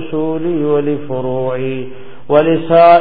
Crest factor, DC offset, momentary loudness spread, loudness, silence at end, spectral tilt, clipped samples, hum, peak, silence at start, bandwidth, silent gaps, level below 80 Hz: 14 dB; 5%; 12 LU; -14 LUFS; 0 s; -10.5 dB/octave; under 0.1%; none; 0 dBFS; 0 s; 4.9 kHz; none; -48 dBFS